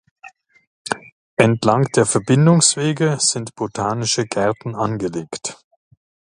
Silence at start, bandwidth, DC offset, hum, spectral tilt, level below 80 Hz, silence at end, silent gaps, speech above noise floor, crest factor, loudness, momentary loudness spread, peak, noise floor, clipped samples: 0.25 s; 11.5 kHz; under 0.1%; none; -4.5 dB/octave; -56 dBFS; 0.8 s; 0.67-0.85 s, 1.12-1.37 s; 28 dB; 20 dB; -18 LUFS; 14 LU; 0 dBFS; -45 dBFS; under 0.1%